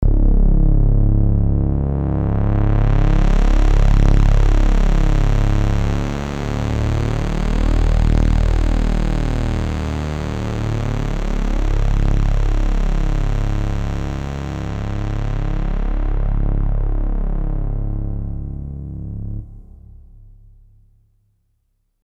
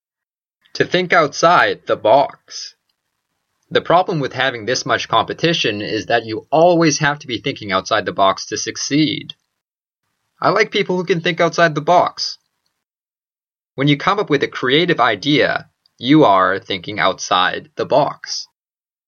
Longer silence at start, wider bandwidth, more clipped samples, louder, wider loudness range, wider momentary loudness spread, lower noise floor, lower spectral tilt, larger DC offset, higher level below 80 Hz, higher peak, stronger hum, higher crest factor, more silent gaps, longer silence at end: second, 0 s vs 0.75 s; about the same, 7.8 kHz vs 7.2 kHz; neither; second, -20 LUFS vs -16 LUFS; first, 10 LU vs 4 LU; second, 8 LU vs 12 LU; second, -66 dBFS vs under -90 dBFS; first, -7.5 dB/octave vs -4 dB/octave; neither; first, -18 dBFS vs -60 dBFS; about the same, 0 dBFS vs 0 dBFS; neither; about the same, 16 dB vs 18 dB; neither; first, 2.45 s vs 0.65 s